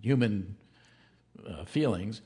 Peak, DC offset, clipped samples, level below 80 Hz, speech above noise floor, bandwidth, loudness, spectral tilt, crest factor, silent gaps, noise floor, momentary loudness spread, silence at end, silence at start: -12 dBFS; under 0.1%; under 0.1%; -62 dBFS; 33 dB; 10.5 kHz; -30 LUFS; -7.5 dB/octave; 20 dB; none; -63 dBFS; 21 LU; 0.05 s; 0 s